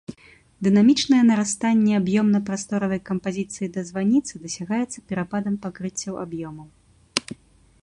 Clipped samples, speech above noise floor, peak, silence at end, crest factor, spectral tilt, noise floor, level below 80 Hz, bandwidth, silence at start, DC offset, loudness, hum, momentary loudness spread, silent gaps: under 0.1%; 27 dB; -2 dBFS; 0.5 s; 20 dB; -5 dB/octave; -49 dBFS; -58 dBFS; 11 kHz; 0.1 s; under 0.1%; -22 LUFS; none; 15 LU; none